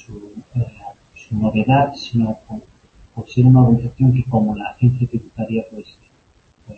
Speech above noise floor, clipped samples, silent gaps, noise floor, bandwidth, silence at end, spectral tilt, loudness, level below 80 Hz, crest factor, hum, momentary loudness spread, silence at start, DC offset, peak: 38 dB; under 0.1%; none; -55 dBFS; 6.8 kHz; 0.05 s; -9 dB/octave; -17 LUFS; -44 dBFS; 18 dB; none; 23 LU; 0.1 s; under 0.1%; -2 dBFS